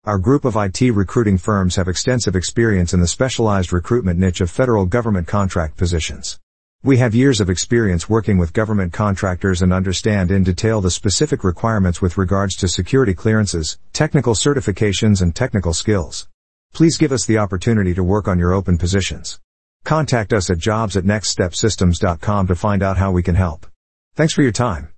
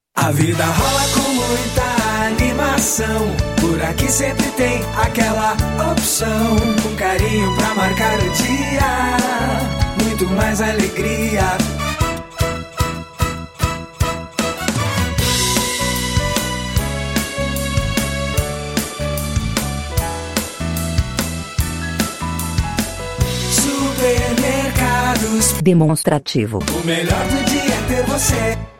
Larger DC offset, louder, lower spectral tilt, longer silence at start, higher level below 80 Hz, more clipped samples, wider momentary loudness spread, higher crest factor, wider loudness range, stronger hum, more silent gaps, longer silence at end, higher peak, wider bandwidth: first, 1% vs under 0.1%; about the same, -17 LUFS vs -18 LUFS; first, -5.5 dB/octave vs -4 dB/octave; second, 0 s vs 0.15 s; second, -36 dBFS vs -28 dBFS; neither; about the same, 5 LU vs 6 LU; about the same, 14 dB vs 16 dB; second, 2 LU vs 5 LU; neither; first, 6.43-6.79 s, 16.34-16.69 s, 19.44-19.80 s, 23.76-24.11 s vs none; about the same, 0.1 s vs 0.05 s; about the same, -2 dBFS vs -2 dBFS; second, 8.8 kHz vs 17 kHz